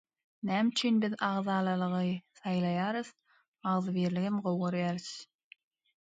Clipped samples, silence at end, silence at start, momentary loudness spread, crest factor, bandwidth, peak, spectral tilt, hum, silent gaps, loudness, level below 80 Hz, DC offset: under 0.1%; 0.8 s; 0.45 s; 10 LU; 18 dB; 9.2 kHz; -16 dBFS; -6 dB/octave; none; 3.48-3.54 s; -32 LUFS; -76 dBFS; under 0.1%